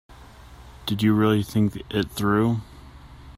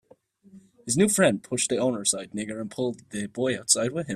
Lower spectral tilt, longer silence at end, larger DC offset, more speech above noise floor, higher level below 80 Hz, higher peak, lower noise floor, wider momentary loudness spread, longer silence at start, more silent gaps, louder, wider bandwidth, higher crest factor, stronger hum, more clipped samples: first, -6.5 dB/octave vs -3.5 dB/octave; about the same, 0.05 s vs 0 s; neither; second, 24 dB vs 32 dB; first, -48 dBFS vs -64 dBFS; second, -8 dBFS vs -4 dBFS; second, -45 dBFS vs -57 dBFS; about the same, 10 LU vs 12 LU; second, 0.15 s vs 0.55 s; neither; about the same, -23 LUFS vs -25 LUFS; about the same, 16 kHz vs 15 kHz; second, 16 dB vs 22 dB; neither; neither